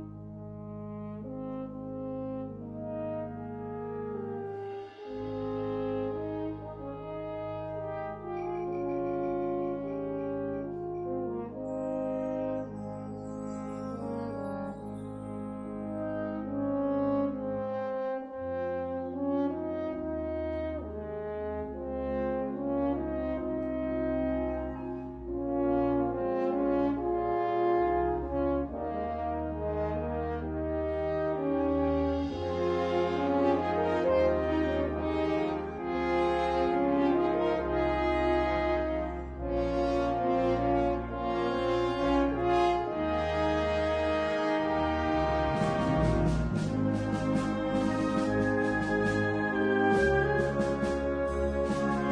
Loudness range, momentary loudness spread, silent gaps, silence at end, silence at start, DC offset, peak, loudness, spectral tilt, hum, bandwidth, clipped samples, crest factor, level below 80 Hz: 8 LU; 11 LU; none; 0 s; 0 s; under 0.1%; -14 dBFS; -31 LUFS; -7.5 dB/octave; none; 10 kHz; under 0.1%; 16 dB; -44 dBFS